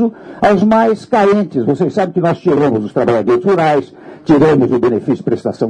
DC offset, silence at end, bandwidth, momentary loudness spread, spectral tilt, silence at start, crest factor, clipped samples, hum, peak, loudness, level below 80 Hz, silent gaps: under 0.1%; 0 s; 10 kHz; 6 LU; -8 dB/octave; 0 s; 12 dB; under 0.1%; none; -2 dBFS; -13 LUFS; -48 dBFS; none